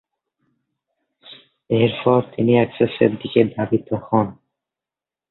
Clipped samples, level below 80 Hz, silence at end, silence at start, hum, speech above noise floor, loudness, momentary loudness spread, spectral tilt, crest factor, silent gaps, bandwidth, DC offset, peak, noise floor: under 0.1%; -56 dBFS; 0.95 s; 1.3 s; none; 71 dB; -19 LUFS; 6 LU; -12 dB/octave; 20 dB; none; 4.2 kHz; under 0.1%; -2 dBFS; -89 dBFS